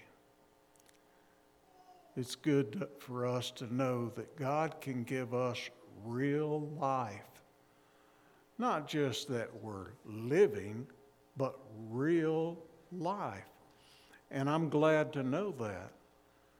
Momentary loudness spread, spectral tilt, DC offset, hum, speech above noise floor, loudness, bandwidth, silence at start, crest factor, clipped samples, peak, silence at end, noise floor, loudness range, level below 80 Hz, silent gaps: 17 LU; -6.5 dB/octave; under 0.1%; none; 32 dB; -36 LUFS; 17.5 kHz; 0 s; 22 dB; under 0.1%; -16 dBFS; 0.65 s; -67 dBFS; 4 LU; -80 dBFS; none